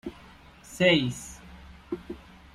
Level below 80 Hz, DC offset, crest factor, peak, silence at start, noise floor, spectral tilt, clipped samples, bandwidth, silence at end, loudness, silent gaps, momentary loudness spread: -54 dBFS; under 0.1%; 22 dB; -8 dBFS; 0.05 s; -51 dBFS; -4.5 dB/octave; under 0.1%; 15.5 kHz; 0.4 s; -25 LUFS; none; 24 LU